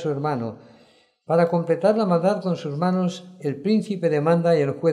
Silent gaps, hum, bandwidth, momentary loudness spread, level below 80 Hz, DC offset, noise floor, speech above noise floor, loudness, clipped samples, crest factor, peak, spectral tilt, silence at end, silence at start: none; none; 10.5 kHz; 8 LU; -74 dBFS; under 0.1%; -57 dBFS; 36 dB; -22 LUFS; under 0.1%; 14 dB; -8 dBFS; -8 dB/octave; 0 s; 0 s